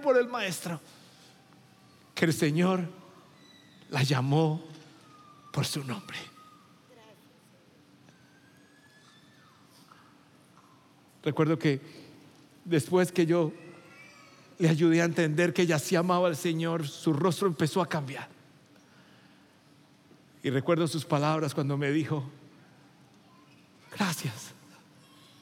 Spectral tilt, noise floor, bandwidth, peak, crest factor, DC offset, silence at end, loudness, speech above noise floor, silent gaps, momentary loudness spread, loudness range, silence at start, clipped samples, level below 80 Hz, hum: -6 dB/octave; -59 dBFS; 17 kHz; -10 dBFS; 20 dB; under 0.1%; 0.9 s; -28 LUFS; 32 dB; none; 21 LU; 12 LU; 0 s; under 0.1%; -80 dBFS; none